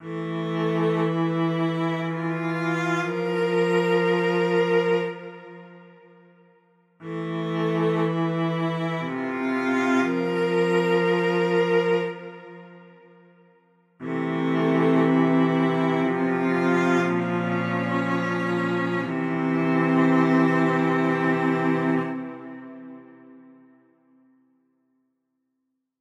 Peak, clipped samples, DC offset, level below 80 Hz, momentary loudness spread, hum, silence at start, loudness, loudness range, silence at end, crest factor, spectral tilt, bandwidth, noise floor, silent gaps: -8 dBFS; under 0.1%; under 0.1%; -74 dBFS; 12 LU; none; 0 s; -23 LUFS; 6 LU; 2.6 s; 16 dB; -7.5 dB/octave; 10.5 kHz; -78 dBFS; none